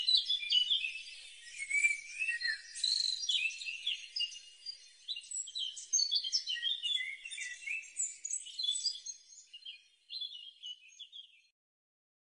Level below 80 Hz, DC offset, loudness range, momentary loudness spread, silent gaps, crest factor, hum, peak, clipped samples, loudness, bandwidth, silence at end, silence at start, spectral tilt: -84 dBFS; under 0.1%; 7 LU; 19 LU; none; 22 dB; none; -16 dBFS; under 0.1%; -34 LUFS; 10 kHz; 1 s; 0 s; 7 dB/octave